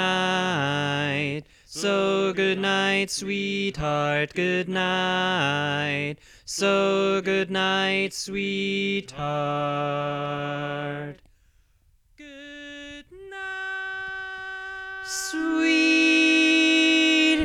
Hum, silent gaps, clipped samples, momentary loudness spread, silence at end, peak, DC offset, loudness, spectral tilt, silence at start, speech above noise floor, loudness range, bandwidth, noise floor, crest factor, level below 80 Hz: none; none; under 0.1%; 17 LU; 0 s; -10 dBFS; under 0.1%; -23 LUFS; -4 dB/octave; 0 s; 37 dB; 13 LU; 14 kHz; -62 dBFS; 16 dB; -56 dBFS